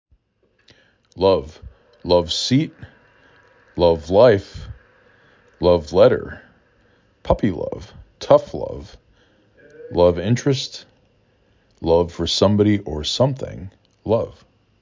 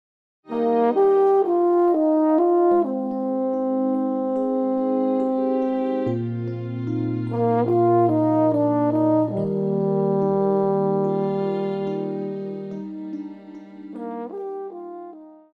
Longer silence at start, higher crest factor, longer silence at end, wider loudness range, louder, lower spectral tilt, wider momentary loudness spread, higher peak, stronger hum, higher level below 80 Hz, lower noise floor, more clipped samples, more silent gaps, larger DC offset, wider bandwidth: first, 1.15 s vs 0.5 s; first, 20 dB vs 14 dB; first, 0.5 s vs 0.2 s; second, 5 LU vs 9 LU; about the same, -19 LUFS vs -21 LUFS; second, -6 dB/octave vs -11 dB/octave; first, 21 LU vs 15 LU; first, 0 dBFS vs -8 dBFS; neither; first, -40 dBFS vs -68 dBFS; first, -64 dBFS vs -41 dBFS; neither; neither; neither; first, 7.6 kHz vs 4.6 kHz